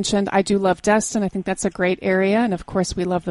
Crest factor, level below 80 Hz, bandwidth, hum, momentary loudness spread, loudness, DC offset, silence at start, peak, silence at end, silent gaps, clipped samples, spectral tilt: 16 dB; -44 dBFS; 11.5 kHz; none; 6 LU; -20 LUFS; under 0.1%; 0 s; -4 dBFS; 0 s; none; under 0.1%; -5 dB/octave